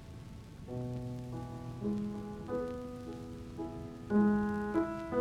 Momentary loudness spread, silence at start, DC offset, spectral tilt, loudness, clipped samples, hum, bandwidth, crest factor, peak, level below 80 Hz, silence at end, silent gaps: 15 LU; 0 s; under 0.1%; -8.5 dB/octave; -37 LUFS; under 0.1%; none; 11 kHz; 18 dB; -18 dBFS; -54 dBFS; 0 s; none